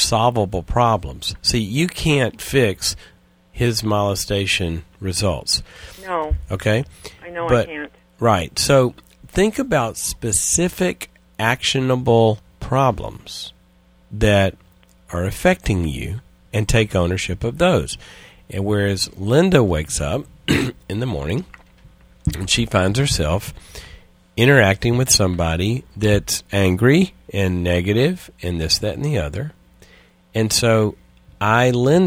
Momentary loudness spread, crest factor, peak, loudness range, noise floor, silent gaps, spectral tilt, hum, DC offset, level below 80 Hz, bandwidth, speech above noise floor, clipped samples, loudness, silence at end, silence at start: 14 LU; 20 dB; 0 dBFS; 4 LU; -53 dBFS; none; -4.5 dB/octave; none; under 0.1%; -36 dBFS; 16.5 kHz; 34 dB; under 0.1%; -19 LUFS; 0 s; 0 s